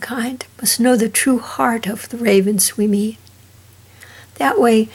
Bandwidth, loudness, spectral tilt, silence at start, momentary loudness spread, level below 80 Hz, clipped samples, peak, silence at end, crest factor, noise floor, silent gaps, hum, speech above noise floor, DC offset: 17.5 kHz; -16 LUFS; -3.5 dB/octave; 0 s; 10 LU; -62 dBFS; under 0.1%; -2 dBFS; 0.05 s; 16 dB; -46 dBFS; none; none; 29 dB; under 0.1%